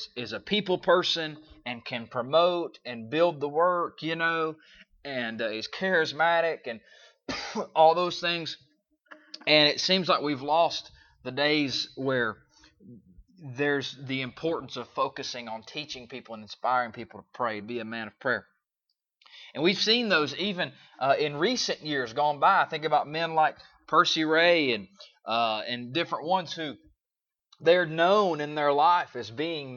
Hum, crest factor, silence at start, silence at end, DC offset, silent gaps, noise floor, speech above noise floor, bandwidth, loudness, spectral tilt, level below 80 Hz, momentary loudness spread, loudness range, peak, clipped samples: none; 22 dB; 0 s; 0 s; under 0.1%; none; under -90 dBFS; over 63 dB; 7.4 kHz; -27 LUFS; -4 dB/octave; -70 dBFS; 15 LU; 8 LU; -6 dBFS; under 0.1%